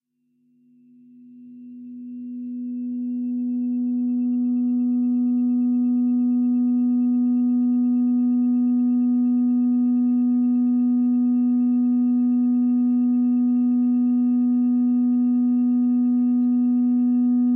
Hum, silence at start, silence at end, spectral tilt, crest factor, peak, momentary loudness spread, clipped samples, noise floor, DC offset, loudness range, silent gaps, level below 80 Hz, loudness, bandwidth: none; 1.35 s; 0 s; -13 dB/octave; 4 dB; -16 dBFS; 6 LU; under 0.1%; -67 dBFS; under 0.1%; 7 LU; none; under -90 dBFS; -21 LUFS; 1.3 kHz